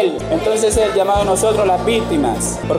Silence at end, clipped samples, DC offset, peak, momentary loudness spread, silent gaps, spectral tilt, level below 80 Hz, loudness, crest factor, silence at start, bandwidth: 0 s; under 0.1%; under 0.1%; -6 dBFS; 4 LU; none; -4.5 dB/octave; -32 dBFS; -16 LUFS; 10 dB; 0 s; 16 kHz